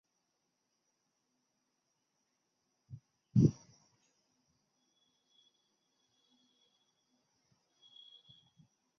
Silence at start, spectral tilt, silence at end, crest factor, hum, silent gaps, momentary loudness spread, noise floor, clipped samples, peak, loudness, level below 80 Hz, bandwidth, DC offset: 3.35 s; -10.5 dB/octave; 5.45 s; 28 dB; none; none; 27 LU; -84 dBFS; under 0.1%; -16 dBFS; -32 LUFS; -64 dBFS; 6.6 kHz; under 0.1%